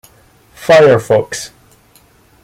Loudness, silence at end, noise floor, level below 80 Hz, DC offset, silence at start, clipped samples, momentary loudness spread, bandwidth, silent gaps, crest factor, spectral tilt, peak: -10 LUFS; 0.95 s; -48 dBFS; -52 dBFS; under 0.1%; 0.6 s; under 0.1%; 17 LU; 16 kHz; none; 14 dB; -5 dB/octave; 0 dBFS